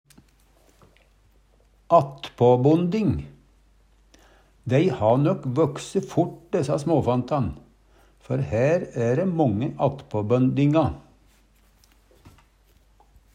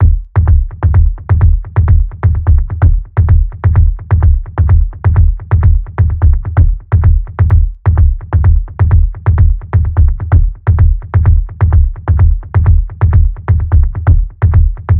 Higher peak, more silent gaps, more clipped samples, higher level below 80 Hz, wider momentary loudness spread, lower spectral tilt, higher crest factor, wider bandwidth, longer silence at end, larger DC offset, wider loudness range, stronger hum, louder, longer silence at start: second, -4 dBFS vs 0 dBFS; neither; second, under 0.1% vs 0.5%; second, -52 dBFS vs -12 dBFS; first, 10 LU vs 2 LU; second, -8 dB/octave vs -13 dB/octave; first, 20 dB vs 8 dB; first, 10.5 kHz vs 2.6 kHz; first, 2.35 s vs 0 s; neither; about the same, 2 LU vs 0 LU; neither; second, -23 LUFS vs -12 LUFS; first, 1.9 s vs 0 s